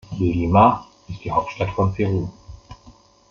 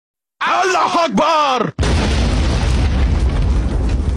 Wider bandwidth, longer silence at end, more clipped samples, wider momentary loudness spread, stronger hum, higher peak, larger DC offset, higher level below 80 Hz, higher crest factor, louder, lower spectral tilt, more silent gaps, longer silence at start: second, 7 kHz vs 10.5 kHz; first, 0.4 s vs 0 s; neither; first, 18 LU vs 4 LU; neither; first, -2 dBFS vs -8 dBFS; neither; second, -44 dBFS vs -18 dBFS; first, 20 dB vs 8 dB; second, -20 LUFS vs -16 LUFS; first, -8.5 dB/octave vs -5.5 dB/octave; neither; second, 0.1 s vs 0.4 s